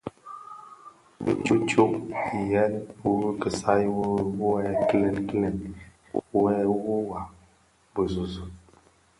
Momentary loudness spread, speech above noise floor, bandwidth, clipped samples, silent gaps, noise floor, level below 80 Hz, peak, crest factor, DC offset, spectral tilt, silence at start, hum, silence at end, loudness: 19 LU; 36 dB; 11.5 kHz; under 0.1%; none; -61 dBFS; -52 dBFS; -6 dBFS; 20 dB; under 0.1%; -6.5 dB/octave; 0.05 s; none; 0.6 s; -26 LUFS